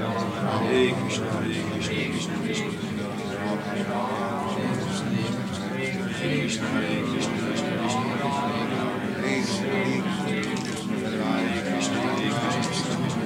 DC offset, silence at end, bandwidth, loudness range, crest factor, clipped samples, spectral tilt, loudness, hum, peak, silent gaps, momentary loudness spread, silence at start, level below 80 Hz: under 0.1%; 0 s; 16 kHz; 2 LU; 18 dB; under 0.1%; -5 dB/octave; -26 LUFS; none; -8 dBFS; none; 4 LU; 0 s; -58 dBFS